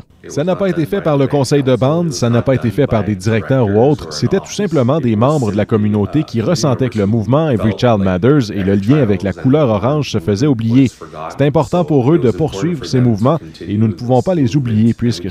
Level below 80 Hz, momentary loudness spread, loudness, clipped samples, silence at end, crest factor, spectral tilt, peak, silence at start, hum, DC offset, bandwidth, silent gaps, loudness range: -42 dBFS; 5 LU; -14 LUFS; under 0.1%; 0 s; 14 dB; -7 dB/octave; 0 dBFS; 0.25 s; none; under 0.1%; 13 kHz; none; 1 LU